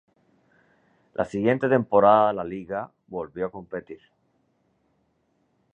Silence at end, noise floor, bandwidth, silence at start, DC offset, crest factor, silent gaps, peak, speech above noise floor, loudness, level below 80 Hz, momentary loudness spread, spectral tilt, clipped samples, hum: 1.8 s; -70 dBFS; 8.2 kHz; 1.2 s; under 0.1%; 22 dB; none; -4 dBFS; 46 dB; -23 LUFS; -62 dBFS; 19 LU; -8 dB/octave; under 0.1%; none